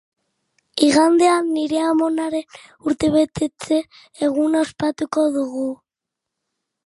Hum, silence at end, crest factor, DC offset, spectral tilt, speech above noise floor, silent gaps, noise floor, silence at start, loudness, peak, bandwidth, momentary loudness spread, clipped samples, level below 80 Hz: none; 1.1 s; 18 dB; under 0.1%; -4.5 dB/octave; 65 dB; none; -84 dBFS; 0.75 s; -19 LUFS; -2 dBFS; 11.5 kHz; 13 LU; under 0.1%; -56 dBFS